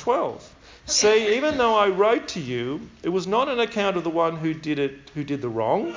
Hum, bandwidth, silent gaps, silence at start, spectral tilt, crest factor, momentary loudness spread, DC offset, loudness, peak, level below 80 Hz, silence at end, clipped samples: none; 7.6 kHz; none; 0 s; -3.5 dB/octave; 16 dB; 11 LU; under 0.1%; -23 LUFS; -8 dBFS; -56 dBFS; 0 s; under 0.1%